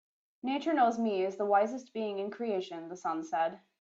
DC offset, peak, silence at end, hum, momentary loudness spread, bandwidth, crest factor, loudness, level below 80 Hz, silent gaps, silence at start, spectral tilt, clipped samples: under 0.1%; -14 dBFS; 0.25 s; none; 9 LU; 7.8 kHz; 18 dB; -32 LUFS; -82 dBFS; none; 0.45 s; -5.5 dB/octave; under 0.1%